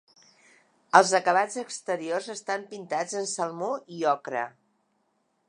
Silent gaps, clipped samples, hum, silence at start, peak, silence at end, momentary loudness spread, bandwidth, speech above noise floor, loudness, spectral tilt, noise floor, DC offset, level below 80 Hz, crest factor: none; under 0.1%; none; 0.95 s; -2 dBFS; 1 s; 13 LU; 11 kHz; 46 dB; -27 LUFS; -3 dB/octave; -73 dBFS; under 0.1%; -84 dBFS; 26 dB